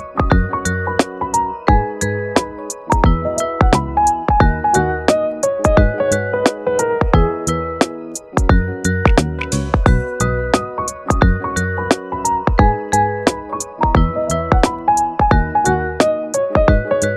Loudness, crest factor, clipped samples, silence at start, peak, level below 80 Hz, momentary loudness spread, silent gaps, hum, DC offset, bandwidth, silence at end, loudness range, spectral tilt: -17 LUFS; 16 dB; under 0.1%; 0 s; 0 dBFS; -22 dBFS; 5 LU; none; none; under 0.1%; 13.5 kHz; 0 s; 2 LU; -5.5 dB/octave